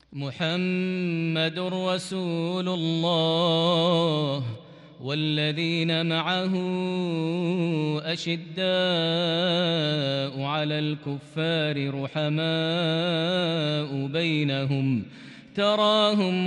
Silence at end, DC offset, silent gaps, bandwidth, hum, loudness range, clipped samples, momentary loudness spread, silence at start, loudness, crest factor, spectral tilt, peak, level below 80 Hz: 0 s; under 0.1%; none; 11 kHz; none; 2 LU; under 0.1%; 7 LU; 0.1 s; -25 LUFS; 16 dB; -6 dB/octave; -8 dBFS; -70 dBFS